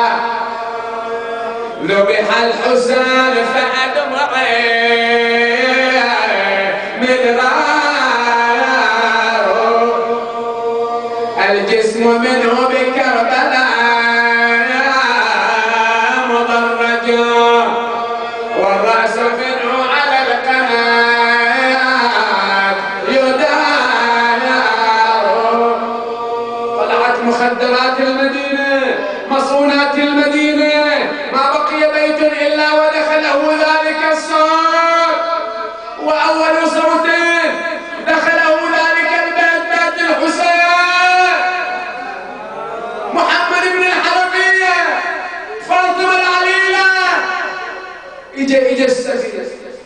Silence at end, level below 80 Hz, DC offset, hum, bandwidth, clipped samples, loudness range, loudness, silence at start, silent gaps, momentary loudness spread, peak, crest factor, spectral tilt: 0 s; -56 dBFS; under 0.1%; none; 10.5 kHz; under 0.1%; 2 LU; -13 LUFS; 0 s; none; 9 LU; 0 dBFS; 14 dB; -2.5 dB/octave